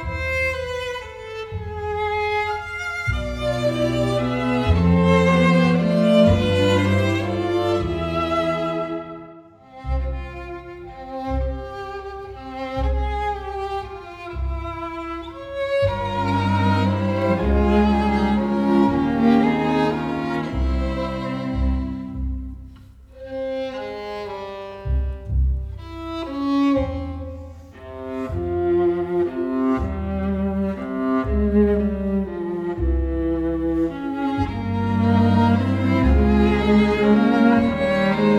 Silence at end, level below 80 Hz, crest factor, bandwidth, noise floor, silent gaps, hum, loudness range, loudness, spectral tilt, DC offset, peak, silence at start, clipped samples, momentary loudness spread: 0 s; -30 dBFS; 16 dB; 11.5 kHz; -44 dBFS; none; none; 11 LU; -21 LUFS; -7.5 dB/octave; under 0.1%; -4 dBFS; 0 s; under 0.1%; 15 LU